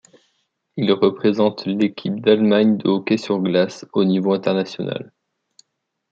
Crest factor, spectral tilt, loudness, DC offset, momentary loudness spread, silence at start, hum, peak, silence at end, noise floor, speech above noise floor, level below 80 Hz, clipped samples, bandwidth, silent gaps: 18 dB; -7 dB/octave; -19 LUFS; under 0.1%; 9 LU; 0.75 s; none; -2 dBFS; 1.05 s; -76 dBFS; 58 dB; -66 dBFS; under 0.1%; 7.6 kHz; none